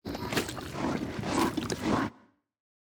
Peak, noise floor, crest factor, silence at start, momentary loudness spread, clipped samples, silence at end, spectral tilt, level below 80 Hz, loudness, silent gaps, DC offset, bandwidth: -14 dBFS; -60 dBFS; 20 dB; 0.05 s; 5 LU; under 0.1%; 0.8 s; -4.5 dB/octave; -52 dBFS; -32 LUFS; none; under 0.1%; over 20 kHz